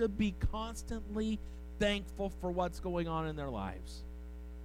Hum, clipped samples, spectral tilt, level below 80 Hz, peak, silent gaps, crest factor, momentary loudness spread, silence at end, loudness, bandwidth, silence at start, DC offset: none; under 0.1%; -6 dB/octave; -44 dBFS; -20 dBFS; none; 18 dB; 14 LU; 0 s; -38 LUFS; 16 kHz; 0 s; under 0.1%